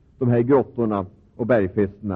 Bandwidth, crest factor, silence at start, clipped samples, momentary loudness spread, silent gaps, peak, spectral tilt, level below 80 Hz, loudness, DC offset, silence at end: 4.1 kHz; 14 dB; 0.2 s; under 0.1%; 10 LU; none; -6 dBFS; -11.5 dB/octave; -54 dBFS; -21 LUFS; under 0.1%; 0 s